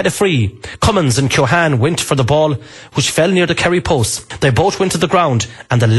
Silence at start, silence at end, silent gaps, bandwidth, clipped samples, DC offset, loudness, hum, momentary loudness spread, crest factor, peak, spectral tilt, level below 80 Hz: 0 s; 0 s; none; 12.5 kHz; under 0.1%; under 0.1%; -14 LUFS; none; 5 LU; 12 dB; -2 dBFS; -5 dB/octave; -38 dBFS